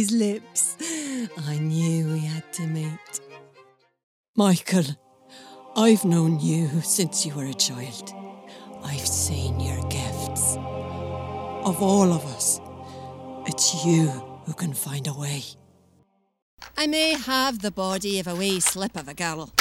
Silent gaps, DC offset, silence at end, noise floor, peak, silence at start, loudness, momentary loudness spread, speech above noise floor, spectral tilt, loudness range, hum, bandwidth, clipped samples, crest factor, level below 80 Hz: 4.03-4.34 s, 16.42-16.58 s; under 0.1%; 0 s; -64 dBFS; -4 dBFS; 0 s; -24 LUFS; 15 LU; 40 dB; -4 dB/octave; 4 LU; none; 16.5 kHz; under 0.1%; 20 dB; -50 dBFS